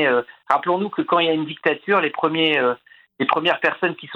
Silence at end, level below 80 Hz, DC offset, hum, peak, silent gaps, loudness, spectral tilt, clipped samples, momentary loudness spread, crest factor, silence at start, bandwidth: 0 s; -70 dBFS; under 0.1%; none; 0 dBFS; none; -20 LUFS; -6.5 dB/octave; under 0.1%; 5 LU; 20 dB; 0 s; 7.2 kHz